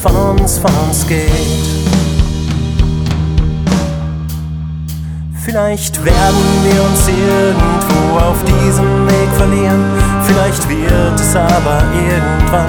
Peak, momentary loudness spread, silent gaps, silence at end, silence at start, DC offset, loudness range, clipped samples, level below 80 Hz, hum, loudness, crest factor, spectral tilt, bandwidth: 0 dBFS; 9 LU; none; 0 s; 0 s; under 0.1%; 5 LU; under 0.1%; -18 dBFS; none; -12 LUFS; 10 dB; -5.5 dB/octave; over 20 kHz